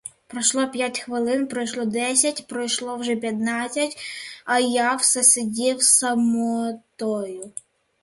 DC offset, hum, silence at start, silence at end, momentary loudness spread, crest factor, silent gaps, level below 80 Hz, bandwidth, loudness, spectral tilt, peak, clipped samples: under 0.1%; none; 0.05 s; 0.5 s; 16 LU; 20 dB; none; -68 dBFS; 12 kHz; -21 LUFS; -1.5 dB/octave; -2 dBFS; under 0.1%